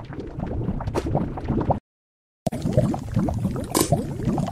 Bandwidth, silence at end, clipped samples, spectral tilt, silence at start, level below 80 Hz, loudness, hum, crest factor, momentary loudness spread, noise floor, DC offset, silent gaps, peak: 15.5 kHz; 0 s; under 0.1%; -6 dB/octave; 0 s; -36 dBFS; -25 LUFS; none; 22 dB; 8 LU; under -90 dBFS; under 0.1%; 1.80-2.46 s; -2 dBFS